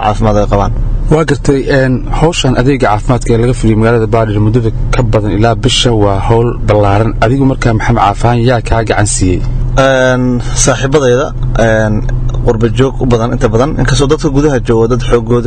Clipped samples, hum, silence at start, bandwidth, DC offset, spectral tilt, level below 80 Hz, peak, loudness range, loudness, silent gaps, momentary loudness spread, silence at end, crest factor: 0.7%; none; 0 s; 9.4 kHz; under 0.1%; -5.5 dB/octave; -16 dBFS; 0 dBFS; 1 LU; -10 LUFS; none; 4 LU; 0 s; 8 dB